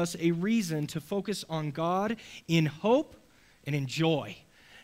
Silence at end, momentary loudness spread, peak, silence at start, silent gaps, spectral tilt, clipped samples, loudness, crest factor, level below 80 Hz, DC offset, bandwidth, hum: 0.05 s; 11 LU; -14 dBFS; 0 s; none; -6 dB/octave; under 0.1%; -30 LUFS; 16 dB; -66 dBFS; under 0.1%; 16 kHz; none